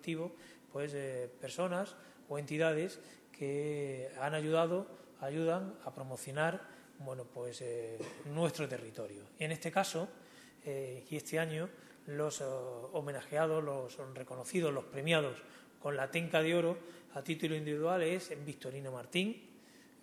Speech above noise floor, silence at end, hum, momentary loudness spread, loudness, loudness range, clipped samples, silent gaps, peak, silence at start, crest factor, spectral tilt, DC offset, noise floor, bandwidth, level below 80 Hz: 23 dB; 0.2 s; none; 14 LU; -38 LUFS; 4 LU; under 0.1%; none; -16 dBFS; 0 s; 22 dB; -5 dB/octave; under 0.1%; -60 dBFS; 14 kHz; -80 dBFS